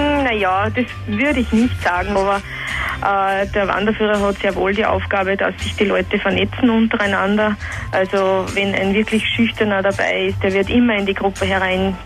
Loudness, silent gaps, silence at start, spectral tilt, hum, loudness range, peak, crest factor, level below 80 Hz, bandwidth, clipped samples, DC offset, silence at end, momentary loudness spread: -17 LUFS; none; 0 s; -5.5 dB/octave; none; 1 LU; -2 dBFS; 16 dB; -36 dBFS; 13.5 kHz; under 0.1%; under 0.1%; 0 s; 4 LU